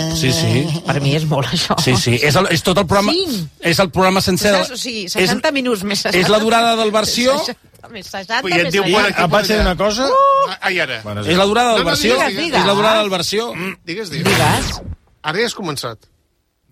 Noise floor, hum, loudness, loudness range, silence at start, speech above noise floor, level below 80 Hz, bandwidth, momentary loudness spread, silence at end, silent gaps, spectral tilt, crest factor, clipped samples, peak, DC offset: -64 dBFS; none; -15 LUFS; 2 LU; 0 s; 48 dB; -36 dBFS; 16 kHz; 11 LU; 0.75 s; none; -4 dB/octave; 12 dB; under 0.1%; -4 dBFS; under 0.1%